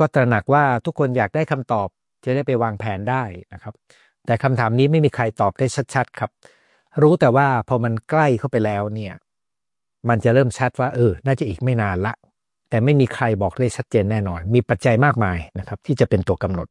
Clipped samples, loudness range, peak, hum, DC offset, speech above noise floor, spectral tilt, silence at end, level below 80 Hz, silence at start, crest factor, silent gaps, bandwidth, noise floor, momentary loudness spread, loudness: under 0.1%; 3 LU; -4 dBFS; none; under 0.1%; 69 dB; -7.5 dB/octave; 0.05 s; -52 dBFS; 0 s; 16 dB; none; 11 kHz; -88 dBFS; 13 LU; -20 LUFS